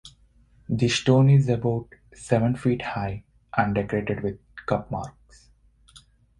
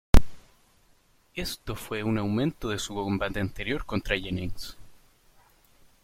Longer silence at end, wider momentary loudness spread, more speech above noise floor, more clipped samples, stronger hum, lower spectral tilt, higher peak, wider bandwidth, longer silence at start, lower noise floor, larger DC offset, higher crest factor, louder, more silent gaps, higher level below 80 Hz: second, 0.4 s vs 1.1 s; first, 15 LU vs 11 LU; about the same, 35 dB vs 33 dB; neither; neither; about the same, -6.5 dB/octave vs -5.5 dB/octave; second, -6 dBFS vs -2 dBFS; second, 10 kHz vs 15.5 kHz; about the same, 0.05 s vs 0.15 s; second, -58 dBFS vs -62 dBFS; neither; about the same, 20 dB vs 24 dB; first, -24 LUFS vs -30 LUFS; neither; second, -50 dBFS vs -32 dBFS